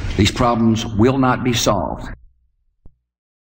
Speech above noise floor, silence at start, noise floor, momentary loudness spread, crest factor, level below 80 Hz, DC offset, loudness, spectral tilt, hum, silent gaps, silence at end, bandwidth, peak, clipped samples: 46 dB; 0 s; -62 dBFS; 12 LU; 18 dB; -34 dBFS; under 0.1%; -17 LUFS; -5 dB/octave; none; none; 0.65 s; 16.5 kHz; -2 dBFS; under 0.1%